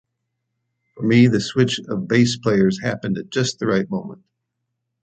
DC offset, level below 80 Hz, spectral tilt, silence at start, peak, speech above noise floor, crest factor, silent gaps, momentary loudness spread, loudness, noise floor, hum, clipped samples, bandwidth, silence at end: under 0.1%; -56 dBFS; -6 dB/octave; 0.95 s; -2 dBFS; 58 dB; 18 dB; none; 11 LU; -19 LUFS; -77 dBFS; none; under 0.1%; 9 kHz; 0.9 s